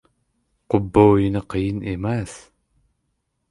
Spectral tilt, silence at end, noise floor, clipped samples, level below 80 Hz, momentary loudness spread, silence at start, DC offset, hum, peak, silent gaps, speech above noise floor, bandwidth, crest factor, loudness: -8 dB/octave; 1.1 s; -73 dBFS; under 0.1%; -42 dBFS; 11 LU; 0.7 s; under 0.1%; none; -2 dBFS; none; 54 dB; 11.5 kHz; 20 dB; -20 LUFS